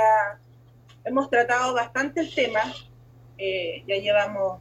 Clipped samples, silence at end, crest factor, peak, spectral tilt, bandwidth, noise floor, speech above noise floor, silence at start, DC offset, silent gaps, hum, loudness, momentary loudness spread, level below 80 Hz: under 0.1%; 0 s; 16 dB; -8 dBFS; -3.5 dB/octave; 12 kHz; -52 dBFS; 28 dB; 0 s; under 0.1%; none; none; -24 LUFS; 10 LU; -60 dBFS